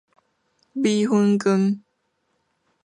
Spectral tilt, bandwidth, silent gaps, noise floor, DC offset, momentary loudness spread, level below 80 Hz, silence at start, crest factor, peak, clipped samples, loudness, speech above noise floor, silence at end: -6.5 dB/octave; 10.5 kHz; none; -72 dBFS; under 0.1%; 11 LU; -72 dBFS; 0.75 s; 14 dB; -8 dBFS; under 0.1%; -21 LUFS; 52 dB; 1.05 s